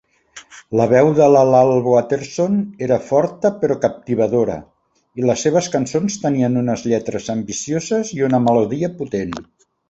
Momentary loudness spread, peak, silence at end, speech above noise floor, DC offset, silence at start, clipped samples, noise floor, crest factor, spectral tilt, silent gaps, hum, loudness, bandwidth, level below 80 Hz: 11 LU; 0 dBFS; 0.45 s; 27 dB; under 0.1%; 0.35 s; under 0.1%; -43 dBFS; 16 dB; -6 dB/octave; none; none; -17 LUFS; 8.2 kHz; -54 dBFS